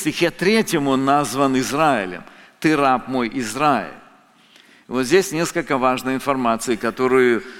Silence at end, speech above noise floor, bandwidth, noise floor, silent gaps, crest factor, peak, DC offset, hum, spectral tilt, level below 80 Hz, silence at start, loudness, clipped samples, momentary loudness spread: 0 s; 32 dB; 17 kHz; -51 dBFS; none; 18 dB; -2 dBFS; under 0.1%; none; -4.5 dB/octave; -50 dBFS; 0 s; -19 LUFS; under 0.1%; 7 LU